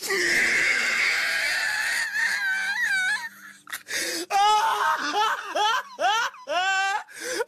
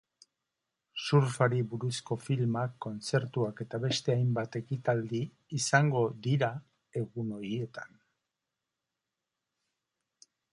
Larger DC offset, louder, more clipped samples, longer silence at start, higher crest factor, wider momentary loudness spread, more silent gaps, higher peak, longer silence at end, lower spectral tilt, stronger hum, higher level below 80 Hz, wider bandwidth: neither; first, -23 LUFS vs -32 LUFS; neither; second, 0 s vs 0.95 s; second, 12 dB vs 24 dB; second, 8 LU vs 11 LU; neither; second, -14 dBFS vs -8 dBFS; second, 0 s vs 2.65 s; second, 0.5 dB/octave vs -5.5 dB/octave; neither; first, -66 dBFS vs -72 dBFS; first, 13.5 kHz vs 11.5 kHz